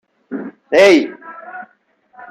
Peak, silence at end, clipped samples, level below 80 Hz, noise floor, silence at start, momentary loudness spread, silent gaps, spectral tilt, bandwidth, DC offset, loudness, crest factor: -2 dBFS; 0.65 s; under 0.1%; -64 dBFS; -56 dBFS; 0.3 s; 24 LU; none; -4 dB/octave; 13.5 kHz; under 0.1%; -11 LUFS; 16 dB